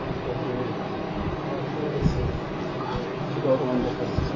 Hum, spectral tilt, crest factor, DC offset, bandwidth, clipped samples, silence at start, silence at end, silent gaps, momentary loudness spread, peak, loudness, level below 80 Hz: none; -8 dB/octave; 18 dB; under 0.1%; 7.4 kHz; under 0.1%; 0 s; 0 s; none; 6 LU; -8 dBFS; -28 LUFS; -38 dBFS